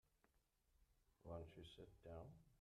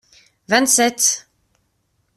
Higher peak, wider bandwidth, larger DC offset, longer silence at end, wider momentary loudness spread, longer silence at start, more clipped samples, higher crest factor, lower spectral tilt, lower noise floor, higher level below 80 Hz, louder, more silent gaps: second, -42 dBFS vs -2 dBFS; second, 13 kHz vs 15.5 kHz; neither; second, 0 s vs 0.95 s; about the same, 7 LU vs 6 LU; second, 0.15 s vs 0.5 s; neither; about the same, 20 dB vs 20 dB; first, -7 dB/octave vs -0.5 dB/octave; first, -83 dBFS vs -67 dBFS; second, -74 dBFS vs -64 dBFS; second, -60 LUFS vs -16 LUFS; neither